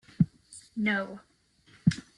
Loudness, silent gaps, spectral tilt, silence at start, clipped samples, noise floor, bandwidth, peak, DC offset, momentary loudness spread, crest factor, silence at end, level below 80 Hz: -30 LUFS; none; -6.5 dB/octave; 0.2 s; under 0.1%; -62 dBFS; 11 kHz; -10 dBFS; under 0.1%; 17 LU; 22 dB; 0.15 s; -58 dBFS